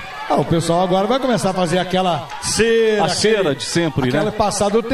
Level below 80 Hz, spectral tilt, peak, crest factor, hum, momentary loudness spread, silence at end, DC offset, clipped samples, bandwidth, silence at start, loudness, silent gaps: -44 dBFS; -4.5 dB/octave; -2 dBFS; 14 dB; none; 4 LU; 0 s; under 0.1%; under 0.1%; 14 kHz; 0 s; -17 LUFS; none